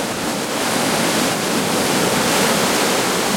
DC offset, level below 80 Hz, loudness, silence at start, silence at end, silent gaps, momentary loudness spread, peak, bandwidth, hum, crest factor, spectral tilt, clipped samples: under 0.1%; -50 dBFS; -17 LUFS; 0 s; 0 s; none; 5 LU; -4 dBFS; 16.5 kHz; none; 14 dB; -2.5 dB/octave; under 0.1%